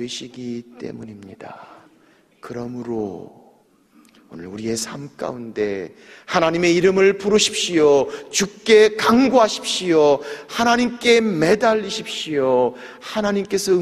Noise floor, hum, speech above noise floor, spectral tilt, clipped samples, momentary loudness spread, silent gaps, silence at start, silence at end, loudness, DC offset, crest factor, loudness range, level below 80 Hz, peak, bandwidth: -55 dBFS; none; 36 dB; -4 dB/octave; under 0.1%; 20 LU; none; 0 s; 0 s; -18 LUFS; under 0.1%; 18 dB; 17 LU; -56 dBFS; -2 dBFS; 14.5 kHz